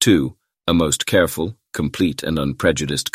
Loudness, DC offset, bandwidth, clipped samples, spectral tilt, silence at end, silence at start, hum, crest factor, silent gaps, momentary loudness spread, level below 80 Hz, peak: -20 LUFS; under 0.1%; 16 kHz; under 0.1%; -4 dB/octave; 0.05 s; 0 s; none; 18 dB; none; 10 LU; -40 dBFS; -2 dBFS